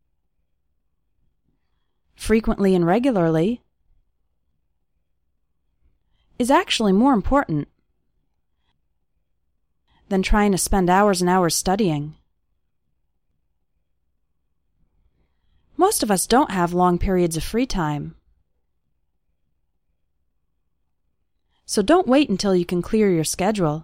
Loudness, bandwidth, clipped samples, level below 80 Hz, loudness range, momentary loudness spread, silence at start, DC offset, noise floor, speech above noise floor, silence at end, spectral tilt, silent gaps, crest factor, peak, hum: -20 LUFS; 16.5 kHz; under 0.1%; -36 dBFS; 8 LU; 9 LU; 2.2 s; under 0.1%; -74 dBFS; 55 dB; 0 s; -5 dB/octave; none; 18 dB; -4 dBFS; none